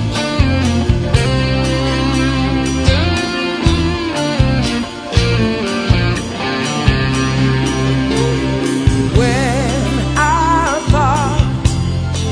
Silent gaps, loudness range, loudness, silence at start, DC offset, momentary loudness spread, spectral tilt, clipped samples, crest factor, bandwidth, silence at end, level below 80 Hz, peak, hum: none; 1 LU; -15 LUFS; 0 s; under 0.1%; 4 LU; -5.5 dB/octave; under 0.1%; 14 dB; 10.5 kHz; 0 s; -22 dBFS; 0 dBFS; none